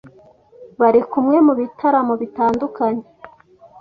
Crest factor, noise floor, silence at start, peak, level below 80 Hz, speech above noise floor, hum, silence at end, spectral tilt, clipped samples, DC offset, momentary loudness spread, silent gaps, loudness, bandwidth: 16 dB; -48 dBFS; 0.05 s; -2 dBFS; -58 dBFS; 32 dB; none; 0.55 s; -8.5 dB/octave; under 0.1%; under 0.1%; 8 LU; none; -17 LUFS; 6 kHz